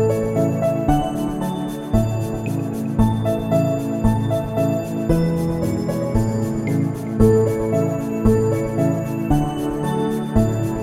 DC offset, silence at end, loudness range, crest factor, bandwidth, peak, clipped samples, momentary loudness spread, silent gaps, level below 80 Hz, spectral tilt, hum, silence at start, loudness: under 0.1%; 0 s; 2 LU; 18 dB; 15.5 kHz; -2 dBFS; under 0.1%; 6 LU; none; -32 dBFS; -8 dB/octave; none; 0 s; -20 LUFS